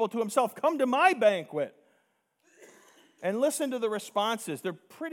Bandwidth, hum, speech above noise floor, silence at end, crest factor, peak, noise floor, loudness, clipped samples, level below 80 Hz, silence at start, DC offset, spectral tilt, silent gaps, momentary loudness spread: 18.5 kHz; none; 45 dB; 0 s; 20 dB; -8 dBFS; -73 dBFS; -28 LUFS; under 0.1%; under -90 dBFS; 0 s; under 0.1%; -3.5 dB/octave; none; 13 LU